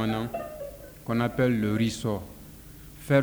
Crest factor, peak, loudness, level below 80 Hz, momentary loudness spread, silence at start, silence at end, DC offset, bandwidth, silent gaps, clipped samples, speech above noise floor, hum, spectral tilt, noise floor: 18 dB; -10 dBFS; -28 LUFS; -50 dBFS; 21 LU; 0 s; 0 s; under 0.1%; over 20 kHz; none; under 0.1%; 20 dB; none; -6.5 dB/octave; -46 dBFS